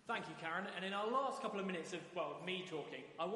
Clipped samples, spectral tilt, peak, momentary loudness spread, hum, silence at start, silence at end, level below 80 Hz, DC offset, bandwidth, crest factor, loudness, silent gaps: under 0.1%; -4.5 dB/octave; -26 dBFS; 7 LU; none; 0.05 s; 0 s; -88 dBFS; under 0.1%; 11.5 kHz; 16 dB; -43 LUFS; none